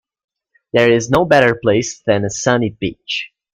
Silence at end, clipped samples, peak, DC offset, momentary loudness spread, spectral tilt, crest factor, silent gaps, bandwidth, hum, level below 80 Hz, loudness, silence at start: 0.3 s; under 0.1%; 0 dBFS; under 0.1%; 11 LU; -4.5 dB/octave; 16 dB; none; 14.5 kHz; none; -46 dBFS; -15 LUFS; 0.75 s